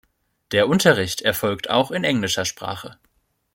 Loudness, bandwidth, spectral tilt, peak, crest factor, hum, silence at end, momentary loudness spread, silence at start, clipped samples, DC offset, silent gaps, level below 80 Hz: -20 LUFS; 17 kHz; -4 dB/octave; -2 dBFS; 20 dB; none; 0.6 s; 14 LU; 0.5 s; under 0.1%; under 0.1%; none; -56 dBFS